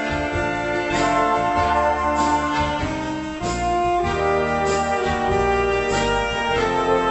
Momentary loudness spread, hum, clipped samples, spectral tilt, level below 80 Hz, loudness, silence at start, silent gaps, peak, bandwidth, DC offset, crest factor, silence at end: 4 LU; none; under 0.1%; -5 dB/octave; -36 dBFS; -21 LUFS; 0 s; none; -6 dBFS; 8.4 kHz; under 0.1%; 14 dB; 0 s